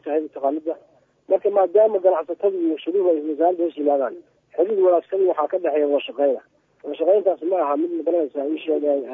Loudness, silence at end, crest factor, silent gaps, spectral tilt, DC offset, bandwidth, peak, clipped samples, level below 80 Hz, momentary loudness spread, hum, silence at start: -21 LUFS; 0 s; 16 dB; none; -7.5 dB/octave; under 0.1%; 3.8 kHz; -4 dBFS; under 0.1%; -80 dBFS; 8 LU; none; 0.05 s